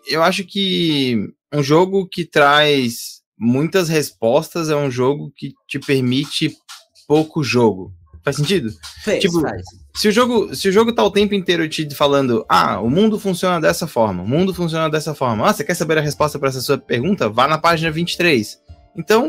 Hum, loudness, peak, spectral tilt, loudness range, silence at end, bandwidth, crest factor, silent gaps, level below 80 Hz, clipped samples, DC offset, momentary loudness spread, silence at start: none; -17 LUFS; -2 dBFS; -5 dB/octave; 3 LU; 0 s; 16 kHz; 16 dB; 3.26-3.32 s; -50 dBFS; under 0.1%; under 0.1%; 9 LU; 0.05 s